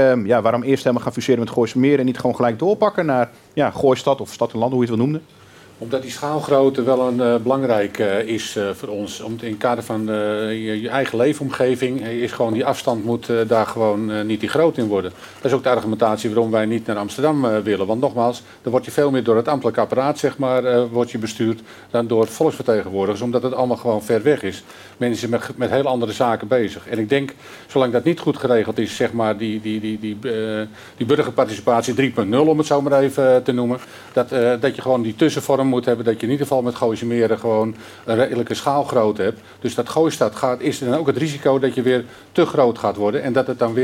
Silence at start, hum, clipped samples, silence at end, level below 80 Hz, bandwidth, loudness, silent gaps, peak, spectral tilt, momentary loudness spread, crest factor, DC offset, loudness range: 0 s; none; under 0.1%; 0 s; -62 dBFS; 16.5 kHz; -19 LUFS; none; -4 dBFS; -6 dB/octave; 7 LU; 14 dB; under 0.1%; 3 LU